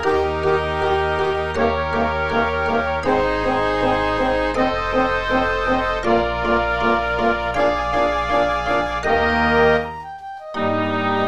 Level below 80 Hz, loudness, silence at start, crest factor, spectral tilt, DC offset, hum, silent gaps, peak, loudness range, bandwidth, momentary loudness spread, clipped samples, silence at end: -34 dBFS; -19 LUFS; 0 s; 16 dB; -6 dB/octave; 1%; none; none; -4 dBFS; 1 LU; 12 kHz; 3 LU; under 0.1%; 0 s